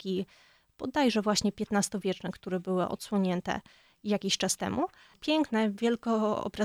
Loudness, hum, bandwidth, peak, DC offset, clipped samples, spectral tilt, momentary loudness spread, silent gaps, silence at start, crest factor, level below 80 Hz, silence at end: -30 LUFS; none; 15.5 kHz; -14 dBFS; under 0.1%; under 0.1%; -4.5 dB/octave; 9 LU; none; 0 s; 16 dB; -62 dBFS; 0 s